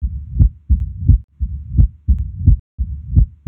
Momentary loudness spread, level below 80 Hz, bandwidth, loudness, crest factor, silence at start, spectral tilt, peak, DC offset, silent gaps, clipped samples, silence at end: 10 LU; -18 dBFS; 0.8 kHz; -18 LUFS; 16 dB; 0 s; -14 dB/octave; 0 dBFS; under 0.1%; 1.24-1.28 s, 2.59-2.78 s; under 0.1%; 0.2 s